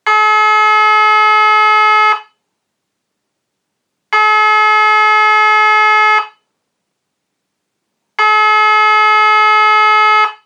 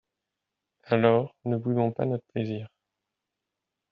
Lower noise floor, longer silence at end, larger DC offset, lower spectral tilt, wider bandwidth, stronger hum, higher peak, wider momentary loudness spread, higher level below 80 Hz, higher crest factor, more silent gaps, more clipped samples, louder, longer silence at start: second, -72 dBFS vs -86 dBFS; second, 0.1 s vs 1.25 s; neither; second, 3.5 dB/octave vs -7 dB/octave; first, 9 kHz vs 5.2 kHz; neither; first, -2 dBFS vs -6 dBFS; second, 4 LU vs 11 LU; second, under -90 dBFS vs -70 dBFS; second, 10 dB vs 24 dB; neither; neither; first, -8 LUFS vs -27 LUFS; second, 0.05 s vs 0.85 s